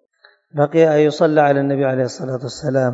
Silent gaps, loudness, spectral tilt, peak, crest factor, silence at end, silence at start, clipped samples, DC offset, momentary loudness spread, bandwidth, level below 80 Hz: none; -17 LUFS; -7 dB/octave; 0 dBFS; 16 dB; 0 s; 0.55 s; under 0.1%; under 0.1%; 11 LU; 8 kHz; -60 dBFS